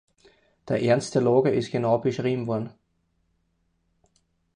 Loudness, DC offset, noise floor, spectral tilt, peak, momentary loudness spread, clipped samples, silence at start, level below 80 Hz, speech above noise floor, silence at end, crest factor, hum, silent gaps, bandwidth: -24 LUFS; under 0.1%; -71 dBFS; -6.5 dB/octave; -8 dBFS; 9 LU; under 0.1%; 0.65 s; -64 dBFS; 48 dB; 1.85 s; 20 dB; none; none; 10.5 kHz